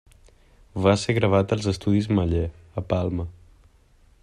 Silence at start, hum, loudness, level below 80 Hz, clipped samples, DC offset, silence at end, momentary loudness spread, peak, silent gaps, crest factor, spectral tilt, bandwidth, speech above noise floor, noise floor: 0.75 s; none; -23 LUFS; -46 dBFS; under 0.1%; under 0.1%; 0.9 s; 12 LU; -6 dBFS; none; 20 dB; -6.5 dB/octave; 10.5 kHz; 34 dB; -57 dBFS